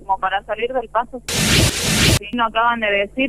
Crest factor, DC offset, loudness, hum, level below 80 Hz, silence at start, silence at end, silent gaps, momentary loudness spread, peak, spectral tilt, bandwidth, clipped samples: 16 dB; under 0.1%; -17 LUFS; none; -32 dBFS; 0 s; 0 s; none; 8 LU; -2 dBFS; -3.5 dB/octave; 15.5 kHz; under 0.1%